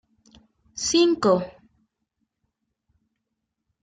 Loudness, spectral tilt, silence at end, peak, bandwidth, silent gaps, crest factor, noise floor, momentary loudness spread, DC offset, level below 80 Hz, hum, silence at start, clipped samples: -21 LUFS; -4 dB/octave; 2.35 s; -8 dBFS; 9.4 kHz; none; 20 dB; -81 dBFS; 20 LU; under 0.1%; -62 dBFS; none; 0.75 s; under 0.1%